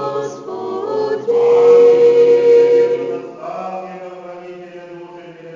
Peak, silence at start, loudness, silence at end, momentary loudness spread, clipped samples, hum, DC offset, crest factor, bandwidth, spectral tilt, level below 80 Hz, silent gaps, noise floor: -2 dBFS; 0 s; -12 LUFS; 0 s; 24 LU; under 0.1%; none; under 0.1%; 12 dB; 7.4 kHz; -6 dB/octave; -70 dBFS; none; -35 dBFS